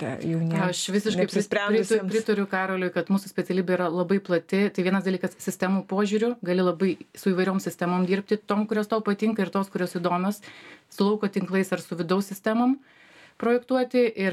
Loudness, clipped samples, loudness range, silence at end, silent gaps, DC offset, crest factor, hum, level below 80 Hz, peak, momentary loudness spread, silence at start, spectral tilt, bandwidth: -25 LUFS; under 0.1%; 2 LU; 0 s; none; under 0.1%; 16 dB; none; -72 dBFS; -10 dBFS; 5 LU; 0 s; -6 dB/octave; 15 kHz